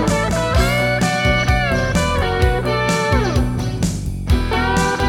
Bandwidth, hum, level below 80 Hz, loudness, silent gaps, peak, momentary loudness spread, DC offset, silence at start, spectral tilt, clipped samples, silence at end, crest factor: 17.5 kHz; none; -24 dBFS; -17 LUFS; none; -2 dBFS; 5 LU; under 0.1%; 0 s; -5 dB/octave; under 0.1%; 0 s; 14 dB